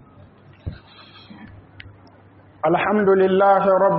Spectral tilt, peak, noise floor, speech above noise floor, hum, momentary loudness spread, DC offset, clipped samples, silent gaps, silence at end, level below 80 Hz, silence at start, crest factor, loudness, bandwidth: -5.5 dB/octave; -6 dBFS; -49 dBFS; 33 dB; none; 21 LU; under 0.1%; under 0.1%; none; 0 s; -50 dBFS; 0.65 s; 16 dB; -17 LUFS; 4.8 kHz